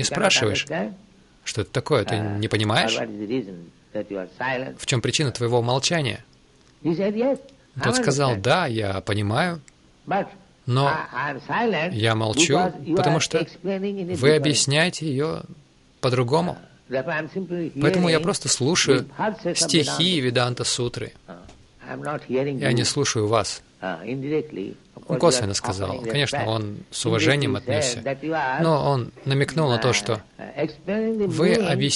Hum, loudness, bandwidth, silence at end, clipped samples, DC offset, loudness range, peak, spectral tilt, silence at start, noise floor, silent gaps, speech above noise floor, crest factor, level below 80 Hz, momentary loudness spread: none; -23 LUFS; 11.5 kHz; 0 s; under 0.1%; under 0.1%; 4 LU; -4 dBFS; -4 dB/octave; 0 s; -55 dBFS; none; 32 dB; 18 dB; -56 dBFS; 11 LU